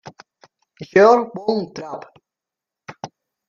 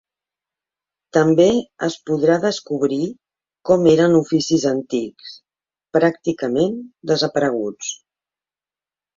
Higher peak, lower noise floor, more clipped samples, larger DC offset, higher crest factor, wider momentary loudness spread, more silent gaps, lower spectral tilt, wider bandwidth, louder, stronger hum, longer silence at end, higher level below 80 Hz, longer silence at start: about the same, -2 dBFS vs -2 dBFS; about the same, -87 dBFS vs under -90 dBFS; neither; neither; about the same, 20 dB vs 18 dB; first, 25 LU vs 15 LU; neither; about the same, -6 dB/octave vs -5.5 dB/octave; about the same, 7.2 kHz vs 7.8 kHz; about the same, -17 LUFS vs -18 LUFS; neither; second, 0.4 s vs 1.25 s; second, -66 dBFS vs -58 dBFS; second, 0.8 s vs 1.15 s